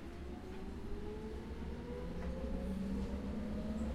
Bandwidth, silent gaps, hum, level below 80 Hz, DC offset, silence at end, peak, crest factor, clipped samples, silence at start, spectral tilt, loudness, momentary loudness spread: 13 kHz; none; none; -46 dBFS; under 0.1%; 0 s; -30 dBFS; 12 dB; under 0.1%; 0 s; -7.5 dB/octave; -44 LUFS; 7 LU